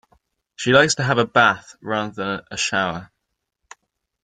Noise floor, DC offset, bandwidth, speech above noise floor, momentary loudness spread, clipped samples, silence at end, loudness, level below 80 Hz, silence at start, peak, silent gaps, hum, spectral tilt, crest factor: -78 dBFS; under 0.1%; 9.6 kHz; 58 dB; 12 LU; under 0.1%; 1.2 s; -19 LUFS; -58 dBFS; 0.6 s; -2 dBFS; none; none; -3.5 dB/octave; 20 dB